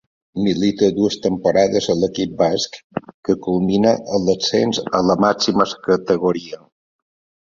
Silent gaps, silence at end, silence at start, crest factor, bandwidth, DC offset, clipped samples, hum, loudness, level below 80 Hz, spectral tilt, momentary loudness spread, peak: 2.84-2.90 s, 3.14-3.23 s; 0.9 s; 0.35 s; 16 dB; 7.6 kHz; under 0.1%; under 0.1%; none; -18 LUFS; -52 dBFS; -5.5 dB/octave; 10 LU; -2 dBFS